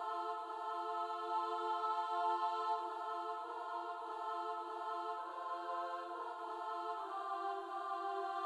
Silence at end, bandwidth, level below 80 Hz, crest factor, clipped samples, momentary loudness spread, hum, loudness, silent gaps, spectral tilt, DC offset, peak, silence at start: 0 s; 12.5 kHz; under -90 dBFS; 16 dB; under 0.1%; 6 LU; none; -41 LUFS; none; -2 dB/octave; under 0.1%; -26 dBFS; 0 s